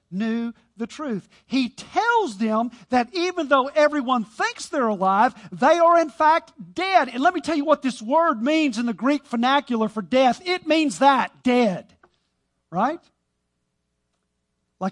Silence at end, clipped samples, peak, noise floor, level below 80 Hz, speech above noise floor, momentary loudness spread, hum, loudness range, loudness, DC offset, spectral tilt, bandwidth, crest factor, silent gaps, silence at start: 0 s; under 0.1%; -4 dBFS; -75 dBFS; -66 dBFS; 54 dB; 11 LU; 60 Hz at -65 dBFS; 5 LU; -21 LUFS; under 0.1%; -4.5 dB/octave; 11.5 kHz; 18 dB; none; 0.1 s